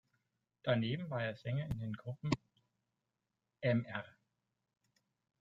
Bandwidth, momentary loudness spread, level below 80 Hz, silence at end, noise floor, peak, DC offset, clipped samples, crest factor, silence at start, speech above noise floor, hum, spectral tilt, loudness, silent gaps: 7.8 kHz; 9 LU; -66 dBFS; 1.3 s; -88 dBFS; -16 dBFS; under 0.1%; under 0.1%; 24 dB; 0.65 s; 51 dB; none; -7.5 dB/octave; -39 LUFS; none